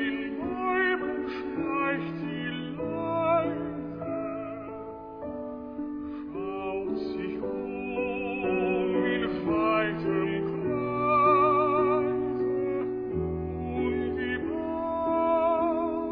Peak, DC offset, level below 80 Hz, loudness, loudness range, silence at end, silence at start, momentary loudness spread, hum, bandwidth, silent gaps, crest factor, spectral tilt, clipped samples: -12 dBFS; under 0.1%; -52 dBFS; -28 LUFS; 9 LU; 0 s; 0 s; 11 LU; none; 5.2 kHz; none; 16 dB; -9.5 dB/octave; under 0.1%